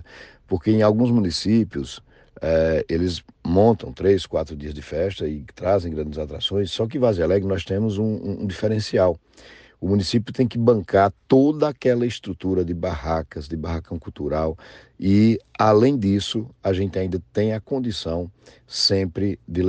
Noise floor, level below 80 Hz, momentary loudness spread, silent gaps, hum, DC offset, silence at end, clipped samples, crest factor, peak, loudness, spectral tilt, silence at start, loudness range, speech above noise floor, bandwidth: -45 dBFS; -42 dBFS; 12 LU; none; none; under 0.1%; 0 s; under 0.1%; 18 dB; -4 dBFS; -22 LUFS; -6.5 dB/octave; 0 s; 3 LU; 24 dB; 9.4 kHz